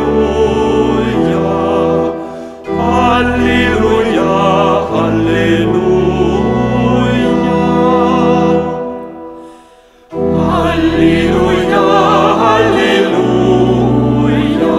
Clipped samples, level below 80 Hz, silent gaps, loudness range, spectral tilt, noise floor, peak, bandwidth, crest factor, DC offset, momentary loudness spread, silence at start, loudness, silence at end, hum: under 0.1%; -30 dBFS; none; 4 LU; -7 dB/octave; -42 dBFS; 0 dBFS; 12 kHz; 12 dB; under 0.1%; 7 LU; 0 s; -11 LUFS; 0 s; none